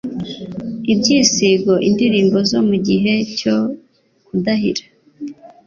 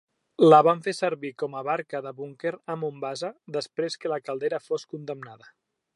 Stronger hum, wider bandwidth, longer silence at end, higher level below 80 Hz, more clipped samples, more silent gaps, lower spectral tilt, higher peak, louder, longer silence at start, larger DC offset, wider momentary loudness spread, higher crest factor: neither; second, 7.4 kHz vs 11.5 kHz; second, 0.2 s vs 0.6 s; first, -52 dBFS vs -82 dBFS; neither; neither; second, -4.5 dB/octave vs -6 dB/octave; first, 0 dBFS vs -4 dBFS; first, -16 LUFS vs -25 LUFS; second, 0.05 s vs 0.4 s; neither; second, 15 LU vs 19 LU; second, 16 dB vs 22 dB